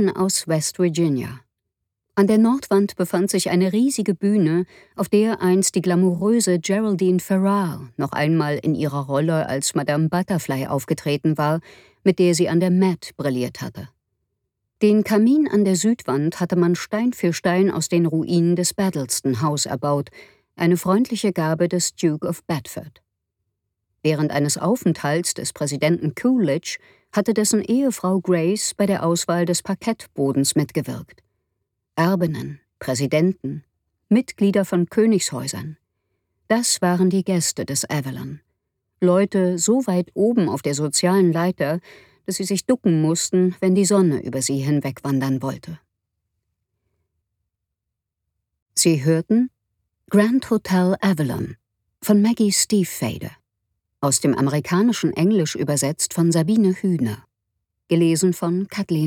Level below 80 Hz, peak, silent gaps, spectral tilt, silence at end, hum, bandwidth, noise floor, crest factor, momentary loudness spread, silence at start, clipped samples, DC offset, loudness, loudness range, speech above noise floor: -60 dBFS; -4 dBFS; 48.62-48.66 s; -5 dB/octave; 0 s; none; 17.5 kHz; -82 dBFS; 18 dB; 9 LU; 0 s; under 0.1%; under 0.1%; -20 LUFS; 4 LU; 63 dB